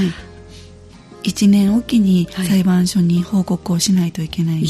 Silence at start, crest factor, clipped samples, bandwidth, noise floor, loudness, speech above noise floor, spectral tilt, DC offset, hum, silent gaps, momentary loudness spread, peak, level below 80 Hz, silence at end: 0 s; 12 dB; under 0.1%; 13.5 kHz; -40 dBFS; -16 LUFS; 25 dB; -6 dB/octave; under 0.1%; none; none; 8 LU; -4 dBFS; -44 dBFS; 0 s